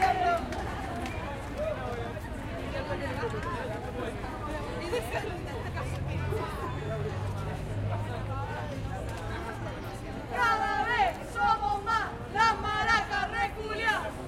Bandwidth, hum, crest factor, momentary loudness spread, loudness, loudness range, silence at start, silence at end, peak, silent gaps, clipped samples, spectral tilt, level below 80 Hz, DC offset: 16.5 kHz; none; 20 dB; 10 LU; -31 LUFS; 7 LU; 0 s; 0 s; -12 dBFS; none; under 0.1%; -5.5 dB/octave; -44 dBFS; under 0.1%